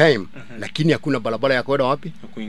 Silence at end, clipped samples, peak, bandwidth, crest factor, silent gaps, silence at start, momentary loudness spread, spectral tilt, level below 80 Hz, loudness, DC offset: 0 s; under 0.1%; 0 dBFS; 12 kHz; 20 dB; none; 0 s; 14 LU; -6 dB/octave; -58 dBFS; -20 LUFS; 2%